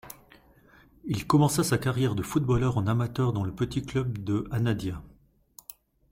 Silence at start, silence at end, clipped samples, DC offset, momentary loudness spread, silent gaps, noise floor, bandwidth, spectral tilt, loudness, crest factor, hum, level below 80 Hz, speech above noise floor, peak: 0.05 s; 1 s; under 0.1%; under 0.1%; 22 LU; none; -57 dBFS; 16.5 kHz; -6.5 dB/octave; -27 LUFS; 18 dB; none; -50 dBFS; 31 dB; -10 dBFS